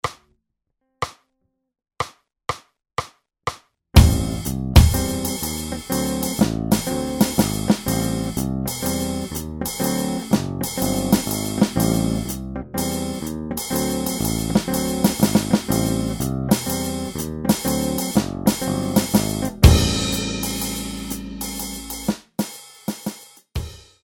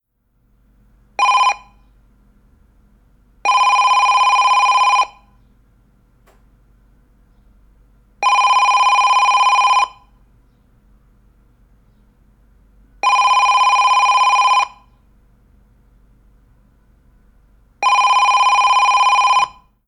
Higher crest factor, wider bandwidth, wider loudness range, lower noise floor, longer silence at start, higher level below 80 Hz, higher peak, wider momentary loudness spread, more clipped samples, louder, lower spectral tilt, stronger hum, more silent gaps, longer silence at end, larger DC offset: first, 22 dB vs 12 dB; first, 19 kHz vs 9.8 kHz; about the same, 6 LU vs 8 LU; first, -75 dBFS vs -62 dBFS; second, 0.05 s vs 1.2 s; first, -28 dBFS vs -52 dBFS; first, 0 dBFS vs -4 dBFS; first, 13 LU vs 8 LU; neither; second, -22 LUFS vs -13 LUFS; first, -5 dB/octave vs 1.5 dB/octave; neither; neither; second, 0.25 s vs 0.4 s; neither